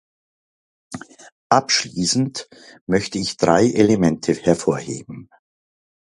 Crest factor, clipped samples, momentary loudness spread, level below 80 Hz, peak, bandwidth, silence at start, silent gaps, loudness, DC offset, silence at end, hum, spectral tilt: 20 dB; under 0.1%; 21 LU; -52 dBFS; 0 dBFS; 11.5 kHz; 0.9 s; 1.32-1.50 s, 2.81-2.87 s; -19 LUFS; under 0.1%; 0.9 s; none; -4.5 dB/octave